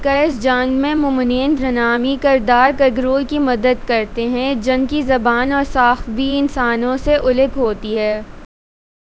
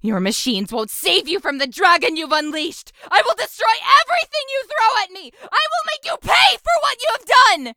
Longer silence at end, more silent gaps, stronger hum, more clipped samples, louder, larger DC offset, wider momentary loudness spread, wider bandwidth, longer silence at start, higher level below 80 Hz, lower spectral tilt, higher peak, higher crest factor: first, 0.6 s vs 0.05 s; neither; neither; neither; about the same, -16 LUFS vs -17 LUFS; neither; second, 6 LU vs 11 LU; second, 8 kHz vs over 20 kHz; about the same, 0 s vs 0.05 s; first, -34 dBFS vs -52 dBFS; first, -5.5 dB/octave vs -2 dB/octave; about the same, 0 dBFS vs 0 dBFS; about the same, 16 dB vs 18 dB